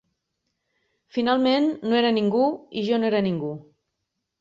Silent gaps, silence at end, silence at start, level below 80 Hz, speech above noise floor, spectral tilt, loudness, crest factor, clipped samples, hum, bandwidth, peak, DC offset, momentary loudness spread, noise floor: none; 0.8 s; 1.15 s; -68 dBFS; 58 dB; -7 dB/octave; -23 LUFS; 16 dB; under 0.1%; none; 7.6 kHz; -8 dBFS; under 0.1%; 10 LU; -80 dBFS